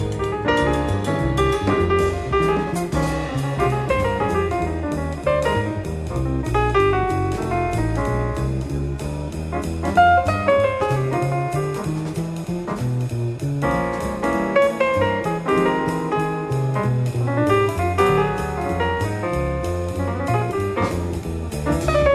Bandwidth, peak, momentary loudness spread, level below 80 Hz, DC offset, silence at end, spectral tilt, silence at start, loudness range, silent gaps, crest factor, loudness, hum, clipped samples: 14.5 kHz; -4 dBFS; 8 LU; -32 dBFS; under 0.1%; 0 s; -6.5 dB/octave; 0 s; 3 LU; none; 16 dB; -21 LUFS; none; under 0.1%